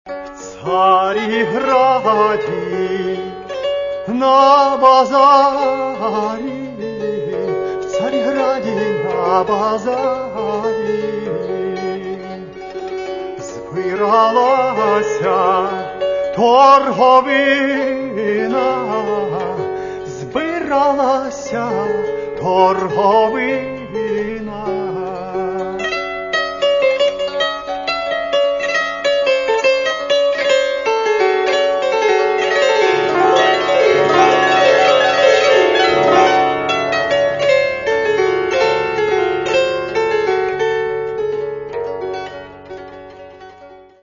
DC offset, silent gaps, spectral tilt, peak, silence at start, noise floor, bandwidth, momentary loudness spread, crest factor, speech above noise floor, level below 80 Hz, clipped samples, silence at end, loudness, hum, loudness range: under 0.1%; none; -4 dB/octave; 0 dBFS; 0.05 s; -40 dBFS; 7.4 kHz; 13 LU; 16 dB; 27 dB; -52 dBFS; under 0.1%; 0.25 s; -15 LUFS; none; 7 LU